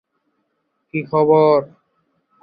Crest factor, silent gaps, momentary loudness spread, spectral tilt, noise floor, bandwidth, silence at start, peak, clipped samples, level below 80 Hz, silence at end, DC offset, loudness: 18 dB; none; 14 LU; -11.5 dB/octave; -71 dBFS; 5 kHz; 0.95 s; -2 dBFS; under 0.1%; -64 dBFS; 0.8 s; under 0.1%; -16 LUFS